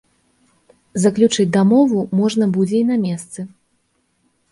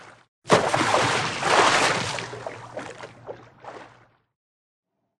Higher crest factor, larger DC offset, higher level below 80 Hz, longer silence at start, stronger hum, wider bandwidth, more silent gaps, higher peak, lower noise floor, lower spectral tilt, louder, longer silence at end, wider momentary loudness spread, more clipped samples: second, 16 dB vs 22 dB; neither; about the same, -60 dBFS vs -60 dBFS; first, 0.95 s vs 0 s; neither; second, 11.5 kHz vs 13.5 kHz; second, none vs 0.28-0.42 s; about the same, -2 dBFS vs -4 dBFS; first, -65 dBFS vs -55 dBFS; first, -6 dB/octave vs -3 dB/octave; first, -16 LUFS vs -21 LUFS; second, 1.05 s vs 1.3 s; second, 15 LU vs 24 LU; neither